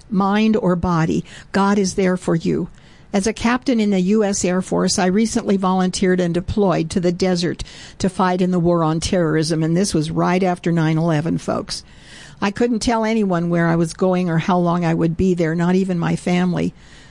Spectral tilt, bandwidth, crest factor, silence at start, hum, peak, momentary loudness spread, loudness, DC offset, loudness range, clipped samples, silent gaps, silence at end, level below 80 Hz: -6 dB/octave; 11.5 kHz; 10 dB; 0.1 s; none; -8 dBFS; 7 LU; -18 LUFS; 0.2%; 2 LU; under 0.1%; none; 0.15 s; -42 dBFS